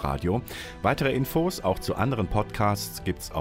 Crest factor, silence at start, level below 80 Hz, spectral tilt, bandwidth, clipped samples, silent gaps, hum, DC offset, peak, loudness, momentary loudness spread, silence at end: 16 dB; 0 s; -42 dBFS; -5.5 dB/octave; 16 kHz; under 0.1%; none; none; under 0.1%; -10 dBFS; -27 LUFS; 6 LU; 0 s